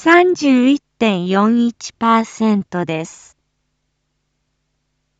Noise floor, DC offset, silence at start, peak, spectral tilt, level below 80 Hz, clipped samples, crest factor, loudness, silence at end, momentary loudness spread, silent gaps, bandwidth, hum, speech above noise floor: -70 dBFS; under 0.1%; 0 s; 0 dBFS; -5.5 dB/octave; -62 dBFS; under 0.1%; 16 dB; -15 LUFS; 2.1 s; 10 LU; none; 8 kHz; none; 55 dB